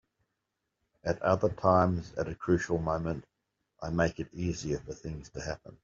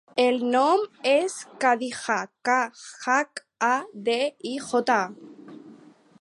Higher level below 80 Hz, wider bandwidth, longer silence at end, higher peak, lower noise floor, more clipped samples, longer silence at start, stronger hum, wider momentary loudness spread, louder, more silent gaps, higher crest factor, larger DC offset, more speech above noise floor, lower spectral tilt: first, -52 dBFS vs -80 dBFS; second, 7.6 kHz vs 11.5 kHz; second, 0.1 s vs 0.45 s; second, -10 dBFS vs -6 dBFS; first, -84 dBFS vs -51 dBFS; neither; first, 1.05 s vs 0.15 s; neither; first, 15 LU vs 12 LU; second, -31 LUFS vs -25 LUFS; neither; about the same, 22 dB vs 18 dB; neither; first, 53 dB vs 27 dB; first, -6.5 dB/octave vs -3 dB/octave